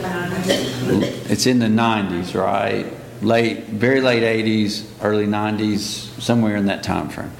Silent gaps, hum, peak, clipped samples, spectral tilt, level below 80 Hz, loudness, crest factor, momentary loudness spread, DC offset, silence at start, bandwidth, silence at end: none; none; -2 dBFS; under 0.1%; -5 dB/octave; -50 dBFS; -19 LUFS; 18 dB; 7 LU; under 0.1%; 0 s; 17 kHz; 0 s